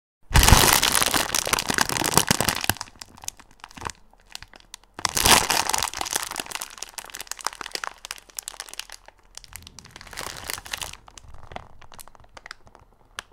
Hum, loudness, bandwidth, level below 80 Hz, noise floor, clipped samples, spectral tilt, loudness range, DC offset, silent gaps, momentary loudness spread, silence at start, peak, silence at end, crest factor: none; -21 LUFS; 17 kHz; -34 dBFS; -53 dBFS; under 0.1%; -2 dB/octave; 16 LU; under 0.1%; none; 26 LU; 0.3 s; 0 dBFS; 0.1 s; 26 dB